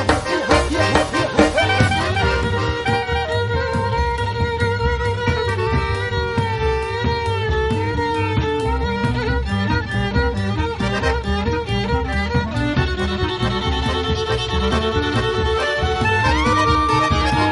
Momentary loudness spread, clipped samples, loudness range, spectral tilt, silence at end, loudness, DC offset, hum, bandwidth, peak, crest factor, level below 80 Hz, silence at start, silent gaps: 5 LU; under 0.1%; 3 LU; -5.5 dB/octave; 0 s; -19 LUFS; under 0.1%; none; 11.5 kHz; 0 dBFS; 18 dB; -28 dBFS; 0 s; none